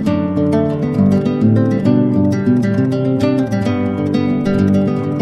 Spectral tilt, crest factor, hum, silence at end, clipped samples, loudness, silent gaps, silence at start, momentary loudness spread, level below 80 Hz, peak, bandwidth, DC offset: -9 dB/octave; 12 dB; none; 0 s; under 0.1%; -15 LUFS; none; 0 s; 3 LU; -44 dBFS; -2 dBFS; 10.5 kHz; under 0.1%